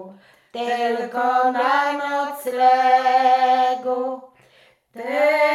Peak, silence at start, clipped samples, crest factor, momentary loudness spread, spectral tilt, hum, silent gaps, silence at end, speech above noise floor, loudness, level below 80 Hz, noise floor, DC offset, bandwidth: -6 dBFS; 0 s; under 0.1%; 14 dB; 12 LU; -3 dB/octave; none; none; 0 s; 37 dB; -19 LUFS; -80 dBFS; -55 dBFS; under 0.1%; 14 kHz